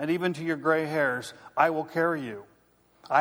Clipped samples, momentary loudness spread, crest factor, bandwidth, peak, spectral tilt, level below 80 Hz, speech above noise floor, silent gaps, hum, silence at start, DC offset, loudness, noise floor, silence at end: under 0.1%; 10 LU; 20 dB; over 20 kHz; -8 dBFS; -6 dB/octave; -74 dBFS; 36 dB; none; none; 0 s; under 0.1%; -27 LUFS; -64 dBFS; 0 s